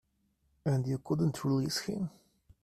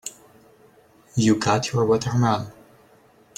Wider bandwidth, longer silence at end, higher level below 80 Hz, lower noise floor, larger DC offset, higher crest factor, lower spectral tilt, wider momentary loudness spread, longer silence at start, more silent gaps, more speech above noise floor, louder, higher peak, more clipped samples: about the same, 14.5 kHz vs 15 kHz; second, 0.55 s vs 0.85 s; second, -64 dBFS vs -54 dBFS; first, -75 dBFS vs -55 dBFS; neither; about the same, 16 dB vs 18 dB; about the same, -6 dB/octave vs -5.5 dB/octave; second, 8 LU vs 12 LU; first, 0.65 s vs 0.05 s; neither; first, 43 dB vs 35 dB; second, -33 LUFS vs -22 LUFS; second, -18 dBFS vs -6 dBFS; neither